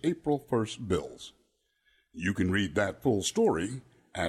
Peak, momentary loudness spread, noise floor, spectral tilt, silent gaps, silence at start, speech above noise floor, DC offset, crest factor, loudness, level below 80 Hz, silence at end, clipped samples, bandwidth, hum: -12 dBFS; 17 LU; -73 dBFS; -5 dB/octave; none; 0.05 s; 43 dB; under 0.1%; 18 dB; -30 LUFS; -56 dBFS; 0 s; under 0.1%; 14 kHz; none